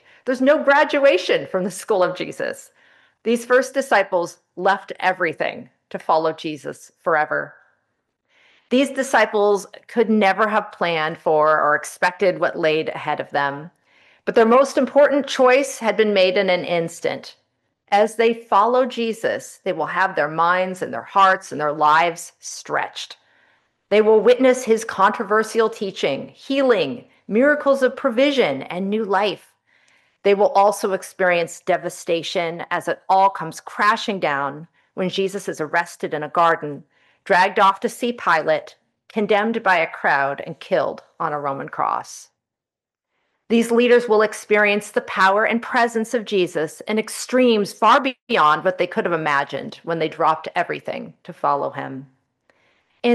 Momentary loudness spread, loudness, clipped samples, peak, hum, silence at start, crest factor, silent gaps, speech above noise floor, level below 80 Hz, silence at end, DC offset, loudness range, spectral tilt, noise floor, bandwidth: 12 LU; -19 LUFS; under 0.1%; -4 dBFS; none; 0.25 s; 16 dB; 48.22-48.27 s; 69 dB; -74 dBFS; 0 s; under 0.1%; 5 LU; -4 dB/octave; -88 dBFS; 12.5 kHz